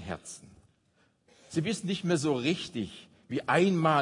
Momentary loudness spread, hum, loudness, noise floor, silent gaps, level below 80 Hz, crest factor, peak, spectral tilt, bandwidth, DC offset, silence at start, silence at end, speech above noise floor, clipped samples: 17 LU; none; -30 LUFS; -69 dBFS; none; -68 dBFS; 20 dB; -12 dBFS; -5.5 dB/octave; 11 kHz; under 0.1%; 0 s; 0 s; 41 dB; under 0.1%